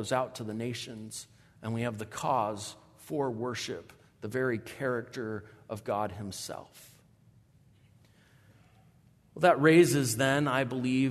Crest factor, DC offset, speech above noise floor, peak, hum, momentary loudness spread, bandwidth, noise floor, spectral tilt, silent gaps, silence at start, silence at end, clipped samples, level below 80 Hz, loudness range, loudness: 22 dB; under 0.1%; 32 dB; -10 dBFS; none; 19 LU; 13.5 kHz; -62 dBFS; -5 dB/octave; none; 0 s; 0 s; under 0.1%; -70 dBFS; 13 LU; -30 LUFS